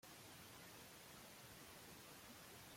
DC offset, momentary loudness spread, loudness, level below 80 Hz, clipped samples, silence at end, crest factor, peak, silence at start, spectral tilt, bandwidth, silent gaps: under 0.1%; 0 LU; -59 LUFS; -80 dBFS; under 0.1%; 0 s; 14 dB; -48 dBFS; 0.05 s; -2.5 dB/octave; 16.5 kHz; none